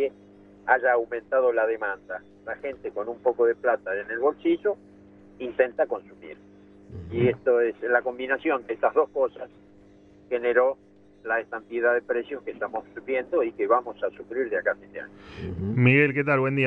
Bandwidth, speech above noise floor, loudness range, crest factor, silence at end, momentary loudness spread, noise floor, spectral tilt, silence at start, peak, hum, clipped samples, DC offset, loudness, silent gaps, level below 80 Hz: 5 kHz; 28 dB; 3 LU; 22 dB; 0 s; 15 LU; -53 dBFS; -9.5 dB/octave; 0 s; -4 dBFS; none; under 0.1%; under 0.1%; -25 LUFS; none; -60 dBFS